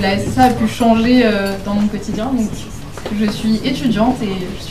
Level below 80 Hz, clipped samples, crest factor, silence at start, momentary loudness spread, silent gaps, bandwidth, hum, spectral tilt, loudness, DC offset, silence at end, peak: -34 dBFS; under 0.1%; 16 dB; 0 s; 11 LU; none; 14.5 kHz; none; -6 dB/octave; -16 LUFS; 2%; 0 s; 0 dBFS